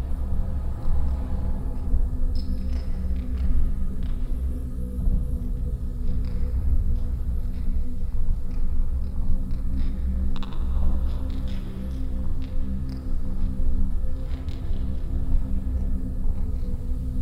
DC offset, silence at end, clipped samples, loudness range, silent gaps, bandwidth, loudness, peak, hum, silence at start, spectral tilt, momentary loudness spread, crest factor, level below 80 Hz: under 0.1%; 0 s; under 0.1%; 2 LU; none; 5.2 kHz; -30 LUFS; -8 dBFS; none; 0 s; -8.5 dB/octave; 4 LU; 14 dB; -24 dBFS